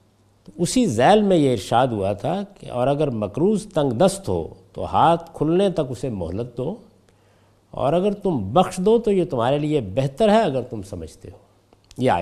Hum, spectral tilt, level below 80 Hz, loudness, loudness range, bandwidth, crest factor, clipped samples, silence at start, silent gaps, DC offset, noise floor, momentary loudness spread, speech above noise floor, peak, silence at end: none; -6 dB/octave; -48 dBFS; -21 LUFS; 4 LU; 14.5 kHz; 18 dB; under 0.1%; 0.55 s; none; under 0.1%; -57 dBFS; 13 LU; 37 dB; -2 dBFS; 0 s